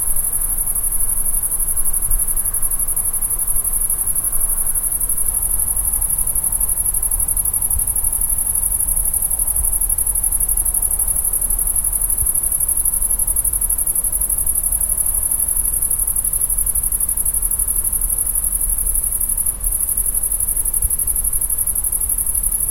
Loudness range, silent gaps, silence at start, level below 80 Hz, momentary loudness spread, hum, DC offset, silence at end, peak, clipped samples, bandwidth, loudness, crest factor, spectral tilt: 1 LU; none; 0 s; -28 dBFS; 2 LU; none; under 0.1%; 0 s; 0 dBFS; under 0.1%; 17 kHz; -16 LUFS; 18 dB; -2 dB/octave